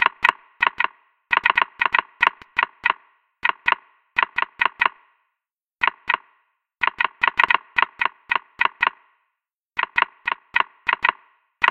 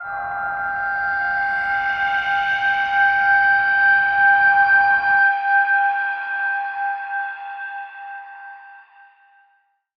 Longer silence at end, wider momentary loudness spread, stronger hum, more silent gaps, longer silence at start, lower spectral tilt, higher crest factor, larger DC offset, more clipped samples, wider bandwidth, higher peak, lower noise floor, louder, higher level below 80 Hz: second, 0 s vs 1.2 s; second, 7 LU vs 16 LU; neither; first, 9.53-9.57 s vs none; about the same, 0 s vs 0 s; about the same, -2 dB/octave vs -2.5 dB/octave; first, 24 dB vs 14 dB; neither; neither; first, 11.5 kHz vs 6.2 kHz; first, 0 dBFS vs -6 dBFS; first, -85 dBFS vs -63 dBFS; second, -21 LUFS vs -17 LUFS; about the same, -62 dBFS vs -58 dBFS